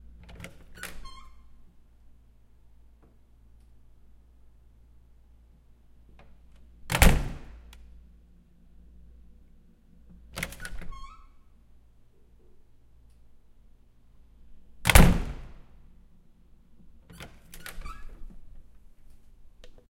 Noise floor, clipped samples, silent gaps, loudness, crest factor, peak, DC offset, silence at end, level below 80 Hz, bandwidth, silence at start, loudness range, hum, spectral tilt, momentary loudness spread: -56 dBFS; under 0.1%; none; -26 LUFS; 30 dB; -2 dBFS; under 0.1%; 1.3 s; -34 dBFS; 16 kHz; 0.4 s; 21 LU; none; -4.5 dB/octave; 31 LU